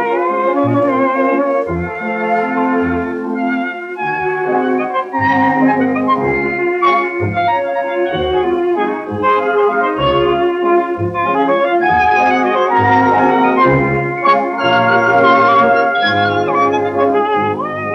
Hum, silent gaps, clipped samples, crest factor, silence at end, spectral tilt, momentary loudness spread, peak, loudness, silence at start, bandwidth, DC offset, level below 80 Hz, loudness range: none; none; under 0.1%; 12 dB; 0 s; -7 dB/octave; 7 LU; -2 dBFS; -14 LUFS; 0 s; 7 kHz; under 0.1%; -44 dBFS; 5 LU